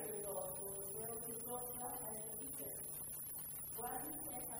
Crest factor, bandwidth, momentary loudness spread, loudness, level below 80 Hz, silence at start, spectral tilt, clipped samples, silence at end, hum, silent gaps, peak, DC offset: 14 dB; over 20 kHz; 2 LU; -44 LUFS; -70 dBFS; 0 s; -3 dB/octave; under 0.1%; 0 s; none; none; -32 dBFS; under 0.1%